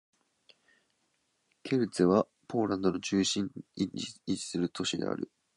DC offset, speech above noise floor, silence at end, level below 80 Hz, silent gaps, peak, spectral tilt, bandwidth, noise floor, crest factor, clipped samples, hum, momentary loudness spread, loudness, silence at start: under 0.1%; 46 dB; 0.3 s; -64 dBFS; none; -12 dBFS; -5 dB/octave; 11 kHz; -76 dBFS; 20 dB; under 0.1%; none; 10 LU; -31 LUFS; 1.65 s